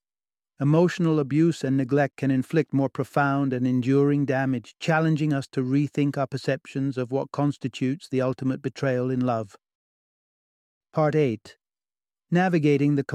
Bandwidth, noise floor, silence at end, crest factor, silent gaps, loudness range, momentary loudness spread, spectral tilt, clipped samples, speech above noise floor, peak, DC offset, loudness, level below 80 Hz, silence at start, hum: 11.5 kHz; under -90 dBFS; 0 s; 16 dB; 9.75-10.81 s; 5 LU; 7 LU; -8 dB/octave; under 0.1%; over 67 dB; -8 dBFS; under 0.1%; -24 LUFS; -66 dBFS; 0.6 s; none